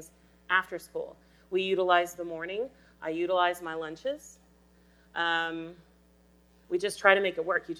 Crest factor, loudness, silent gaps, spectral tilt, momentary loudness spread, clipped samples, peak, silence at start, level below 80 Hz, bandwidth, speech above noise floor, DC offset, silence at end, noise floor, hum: 26 dB; -29 LUFS; none; -3.5 dB/octave; 15 LU; under 0.1%; -6 dBFS; 0 s; -66 dBFS; 19.5 kHz; 32 dB; under 0.1%; 0 s; -62 dBFS; none